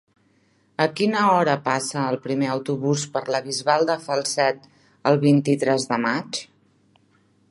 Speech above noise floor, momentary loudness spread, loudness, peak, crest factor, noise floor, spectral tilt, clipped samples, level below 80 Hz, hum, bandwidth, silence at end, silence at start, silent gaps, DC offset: 41 dB; 8 LU; -22 LUFS; -2 dBFS; 20 dB; -62 dBFS; -5 dB/octave; under 0.1%; -70 dBFS; none; 11.5 kHz; 1.05 s; 0.8 s; none; under 0.1%